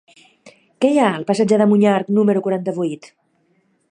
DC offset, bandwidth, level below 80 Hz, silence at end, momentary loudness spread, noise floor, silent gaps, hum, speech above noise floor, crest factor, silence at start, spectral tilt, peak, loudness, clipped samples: under 0.1%; 10.5 kHz; -68 dBFS; 0.85 s; 10 LU; -62 dBFS; none; none; 46 dB; 16 dB; 0.45 s; -7 dB/octave; -2 dBFS; -17 LUFS; under 0.1%